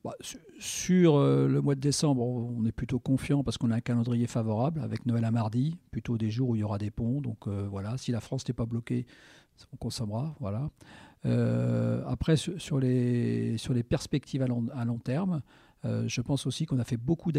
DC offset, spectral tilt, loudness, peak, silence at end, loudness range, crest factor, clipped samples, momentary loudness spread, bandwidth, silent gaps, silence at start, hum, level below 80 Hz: under 0.1%; -6.5 dB/octave; -30 LUFS; -12 dBFS; 0 s; 7 LU; 16 dB; under 0.1%; 8 LU; 14 kHz; none; 0.05 s; none; -52 dBFS